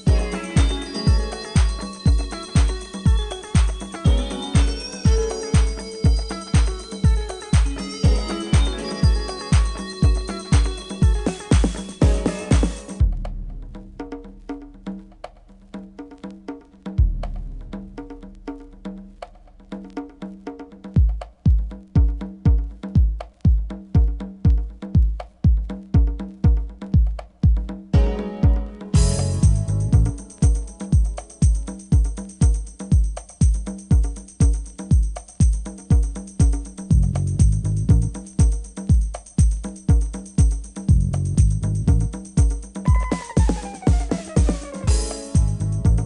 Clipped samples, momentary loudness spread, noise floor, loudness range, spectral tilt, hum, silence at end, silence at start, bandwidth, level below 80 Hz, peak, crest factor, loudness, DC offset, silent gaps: under 0.1%; 16 LU; -43 dBFS; 10 LU; -6.5 dB/octave; none; 0 s; 0 s; 11 kHz; -22 dBFS; -4 dBFS; 14 dB; -22 LUFS; under 0.1%; none